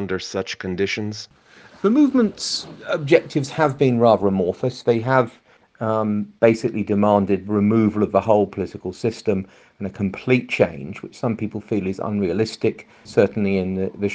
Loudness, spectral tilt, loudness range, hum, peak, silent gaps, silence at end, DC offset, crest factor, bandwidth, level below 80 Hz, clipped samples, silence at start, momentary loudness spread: -21 LUFS; -6.5 dB/octave; 4 LU; none; 0 dBFS; none; 0 s; under 0.1%; 20 dB; 9.4 kHz; -58 dBFS; under 0.1%; 0 s; 10 LU